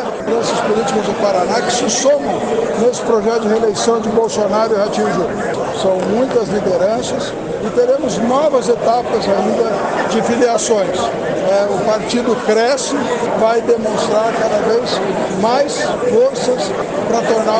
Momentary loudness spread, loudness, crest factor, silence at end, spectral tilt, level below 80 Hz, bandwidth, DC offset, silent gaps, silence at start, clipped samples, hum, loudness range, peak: 4 LU; -15 LUFS; 14 dB; 0 s; -4 dB/octave; -48 dBFS; 9.6 kHz; under 0.1%; none; 0 s; under 0.1%; none; 1 LU; -2 dBFS